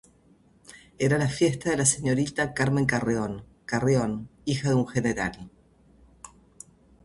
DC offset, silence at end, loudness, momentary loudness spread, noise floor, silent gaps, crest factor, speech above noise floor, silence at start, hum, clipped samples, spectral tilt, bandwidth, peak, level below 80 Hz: under 0.1%; 0.75 s; -26 LUFS; 9 LU; -59 dBFS; none; 22 dB; 34 dB; 0.75 s; none; under 0.1%; -5 dB/octave; 11.5 kHz; -6 dBFS; -52 dBFS